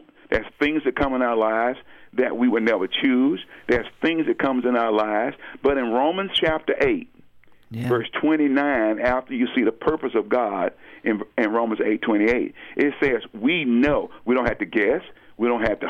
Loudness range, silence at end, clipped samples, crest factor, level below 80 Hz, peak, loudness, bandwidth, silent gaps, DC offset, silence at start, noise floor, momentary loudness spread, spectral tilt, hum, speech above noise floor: 1 LU; 0 s; under 0.1%; 16 dB; -46 dBFS; -6 dBFS; -22 LUFS; 9.8 kHz; none; under 0.1%; 0.3 s; -50 dBFS; 6 LU; -7 dB/octave; none; 28 dB